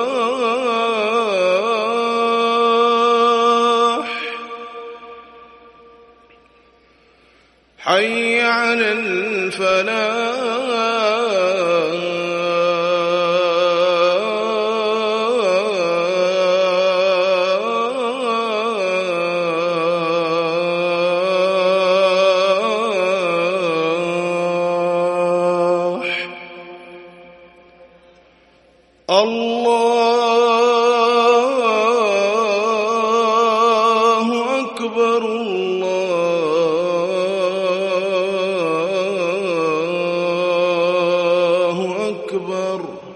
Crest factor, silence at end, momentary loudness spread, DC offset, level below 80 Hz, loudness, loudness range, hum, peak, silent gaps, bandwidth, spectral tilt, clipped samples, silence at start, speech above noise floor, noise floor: 18 dB; 0 s; 7 LU; under 0.1%; -66 dBFS; -17 LUFS; 6 LU; none; 0 dBFS; none; 11.5 kHz; -4 dB/octave; under 0.1%; 0 s; 37 dB; -54 dBFS